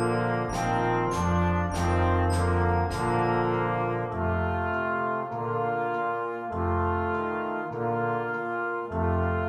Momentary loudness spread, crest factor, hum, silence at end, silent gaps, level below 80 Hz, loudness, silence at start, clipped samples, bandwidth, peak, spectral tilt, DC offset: 5 LU; 14 dB; none; 0 s; none; -42 dBFS; -27 LUFS; 0 s; under 0.1%; 11 kHz; -12 dBFS; -7 dB/octave; under 0.1%